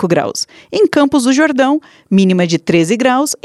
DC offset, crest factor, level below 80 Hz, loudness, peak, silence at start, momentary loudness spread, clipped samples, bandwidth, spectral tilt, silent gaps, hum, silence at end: under 0.1%; 12 dB; -54 dBFS; -13 LUFS; 0 dBFS; 0 s; 8 LU; under 0.1%; 13 kHz; -5 dB/octave; none; none; 0.1 s